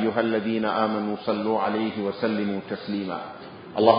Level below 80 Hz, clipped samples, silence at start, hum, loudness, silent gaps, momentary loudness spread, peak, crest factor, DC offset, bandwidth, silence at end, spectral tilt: -64 dBFS; under 0.1%; 0 s; none; -26 LUFS; none; 9 LU; -2 dBFS; 22 dB; under 0.1%; 5.2 kHz; 0 s; -10.5 dB/octave